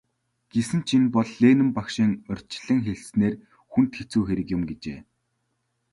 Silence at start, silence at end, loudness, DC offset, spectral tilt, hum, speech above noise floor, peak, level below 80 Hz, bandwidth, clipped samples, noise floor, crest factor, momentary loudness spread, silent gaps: 0.55 s; 0.9 s; -24 LUFS; under 0.1%; -6.5 dB/octave; none; 52 dB; -6 dBFS; -52 dBFS; 11.5 kHz; under 0.1%; -75 dBFS; 18 dB; 14 LU; none